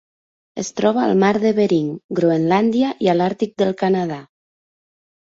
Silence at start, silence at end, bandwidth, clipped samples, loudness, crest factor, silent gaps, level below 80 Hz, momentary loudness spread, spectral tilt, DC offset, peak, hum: 0.55 s; 0.95 s; 7.8 kHz; under 0.1%; -18 LUFS; 16 dB; 2.04-2.09 s; -60 dBFS; 11 LU; -6.5 dB/octave; under 0.1%; -4 dBFS; none